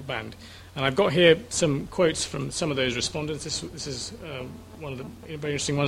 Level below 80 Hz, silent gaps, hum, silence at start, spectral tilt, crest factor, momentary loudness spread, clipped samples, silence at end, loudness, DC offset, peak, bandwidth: -50 dBFS; none; none; 0 s; -4 dB/octave; 22 dB; 19 LU; under 0.1%; 0 s; -25 LUFS; under 0.1%; -4 dBFS; 15.5 kHz